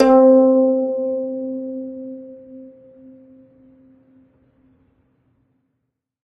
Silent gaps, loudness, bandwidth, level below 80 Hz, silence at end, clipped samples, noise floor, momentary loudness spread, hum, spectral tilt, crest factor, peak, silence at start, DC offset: none; -17 LUFS; 5.2 kHz; -60 dBFS; 3.7 s; under 0.1%; -76 dBFS; 28 LU; none; -7 dB/octave; 20 dB; -2 dBFS; 0 s; under 0.1%